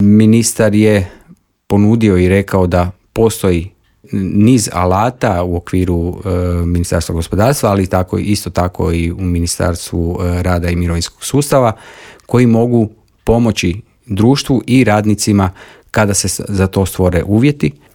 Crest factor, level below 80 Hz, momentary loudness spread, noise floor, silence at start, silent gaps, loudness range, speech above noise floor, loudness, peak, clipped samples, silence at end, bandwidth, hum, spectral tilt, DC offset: 12 dB; -36 dBFS; 8 LU; -45 dBFS; 0 s; none; 3 LU; 33 dB; -13 LUFS; 0 dBFS; under 0.1%; 0.25 s; 18 kHz; none; -6 dB/octave; under 0.1%